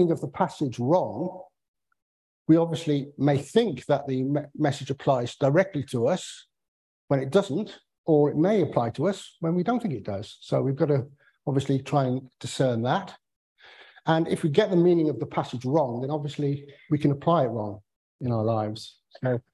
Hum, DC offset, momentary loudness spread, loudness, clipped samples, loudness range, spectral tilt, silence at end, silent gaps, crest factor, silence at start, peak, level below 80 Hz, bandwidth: none; under 0.1%; 13 LU; -26 LUFS; under 0.1%; 2 LU; -7 dB/octave; 0.15 s; 1.68-1.74 s, 2.02-2.45 s, 6.68-7.08 s, 7.98-8.04 s, 13.36-13.55 s, 17.96-18.19 s; 20 dB; 0 s; -6 dBFS; -62 dBFS; 12 kHz